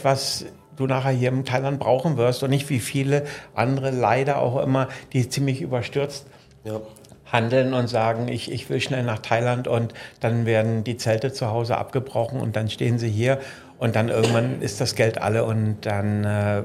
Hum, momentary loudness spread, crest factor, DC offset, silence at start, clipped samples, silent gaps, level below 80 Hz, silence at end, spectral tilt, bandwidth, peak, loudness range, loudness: none; 7 LU; 22 dB; under 0.1%; 0 s; under 0.1%; none; -60 dBFS; 0 s; -6 dB/octave; 15 kHz; -2 dBFS; 2 LU; -23 LUFS